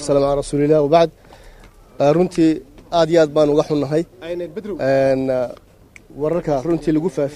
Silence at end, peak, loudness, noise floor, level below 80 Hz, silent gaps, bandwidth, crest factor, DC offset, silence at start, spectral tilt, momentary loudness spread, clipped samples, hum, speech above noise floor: 0 s; 0 dBFS; -18 LUFS; -45 dBFS; -44 dBFS; none; 12 kHz; 18 dB; under 0.1%; 0 s; -6.5 dB/octave; 12 LU; under 0.1%; none; 28 dB